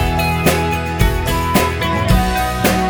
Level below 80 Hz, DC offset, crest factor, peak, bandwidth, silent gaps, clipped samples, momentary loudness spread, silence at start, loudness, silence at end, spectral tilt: -22 dBFS; under 0.1%; 14 dB; 0 dBFS; over 20 kHz; none; under 0.1%; 2 LU; 0 s; -16 LUFS; 0 s; -5 dB/octave